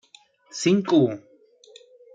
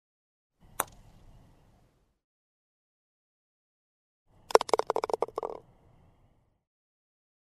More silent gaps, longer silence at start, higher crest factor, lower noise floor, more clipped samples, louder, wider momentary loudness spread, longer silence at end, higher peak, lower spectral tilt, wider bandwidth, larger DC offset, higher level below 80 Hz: second, none vs 2.24-4.26 s; second, 0.55 s vs 0.8 s; second, 18 dB vs 36 dB; second, -55 dBFS vs -67 dBFS; neither; first, -21 LUFS vs -30 LUFS; about the same, 19 LU vs 18 LU; second, 0.95 s vs 1.9 s; second, -8 dBFS vs 0 dBFS; first, -5.5 dB/octave vs -2.5 dB/octave; second, 9.4 kHz vs 13.5 kHz; neither; second, -70 dBFS vs -64 dBFS